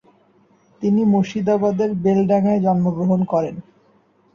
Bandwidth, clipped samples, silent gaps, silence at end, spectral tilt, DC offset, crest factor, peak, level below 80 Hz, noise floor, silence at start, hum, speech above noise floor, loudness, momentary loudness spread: 7 kHz; under 0.1%; none; 0.75 s; -9 dB/octave; under 0.1%; 12 dB; -6 dBFS; -58 dBFS; -57 dBFS; 0.8 s; none; 40 dB; -18 LUFS; 6 LU